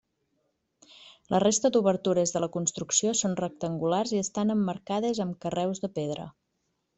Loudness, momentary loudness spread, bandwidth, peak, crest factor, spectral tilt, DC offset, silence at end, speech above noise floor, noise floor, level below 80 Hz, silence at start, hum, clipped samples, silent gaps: -27 LUFS; 8 LU; 8.4 kHz; -10 dBFS; 20 dB; -4.5 dB/octave; under 0.1%; 0.65 s; 50 dB; -78 dBFS; -66 dBFS; 1 s; none; under 0.1%; none